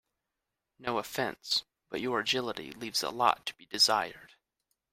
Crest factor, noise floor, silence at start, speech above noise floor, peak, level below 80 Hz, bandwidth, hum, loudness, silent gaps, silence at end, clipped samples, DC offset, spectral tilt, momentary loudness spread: 24 dB; -87 dBFS; 0.8 s; 55 dB; -10 dBFS; -70 dBFS; 16 kHz; none; -31 LUFS; none; 0.65 s; under 0.1%; under 0.1%; -2 dB/octave; 14 LU